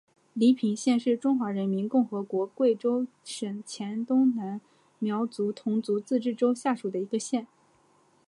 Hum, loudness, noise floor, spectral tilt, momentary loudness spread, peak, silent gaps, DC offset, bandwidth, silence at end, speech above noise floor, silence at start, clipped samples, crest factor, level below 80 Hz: none; -28 LUFS; -64 dBFS; -6 dB/octave; 10 LU; -12 dBFS; none; under 0.1%; 11.5 kHz; 0.85 s; 37 dB; 0.35 s; under 0.1%; 16 dB; -82 dBFS